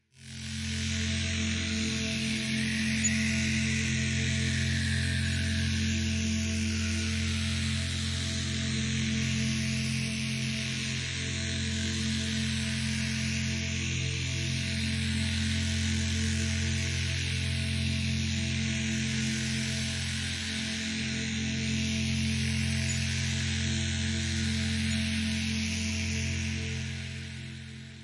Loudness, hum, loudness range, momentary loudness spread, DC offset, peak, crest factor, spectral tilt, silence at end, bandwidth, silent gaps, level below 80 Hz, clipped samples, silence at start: -30 LUFS; none; 2 LU; 3 LU; under 0.1%; -16 dBFS; 14 dB; -3.5 dB/octave; 0 s; 11.5 kHz; none; -50 dBFS; under 0.1%; 0.15 s